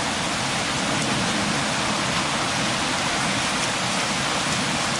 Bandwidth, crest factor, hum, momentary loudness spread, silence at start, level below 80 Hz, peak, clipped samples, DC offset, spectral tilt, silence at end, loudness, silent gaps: 11.5 kHz; 14 dB; none; 1 LU; 0 s; -48 dBFS; -8 dBFS; under 0.1%; under 0.1%; -2.5 dB/octave; 0 s; -22 LUFS; none